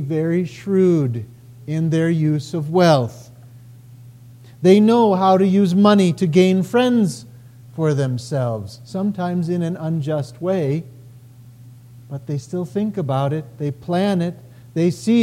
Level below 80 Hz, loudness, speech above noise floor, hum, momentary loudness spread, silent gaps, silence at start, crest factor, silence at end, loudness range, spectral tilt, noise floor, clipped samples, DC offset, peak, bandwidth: -60 dBFS; -18 LUFS; 25 dB; none; 13 LU; none; 0 s; 18 dB; 0 s; 10 LU; -7.5 dB/octave; -43 dBFS; under 0.1%; under 0.1%; -2 dBFS; 13.5 kHz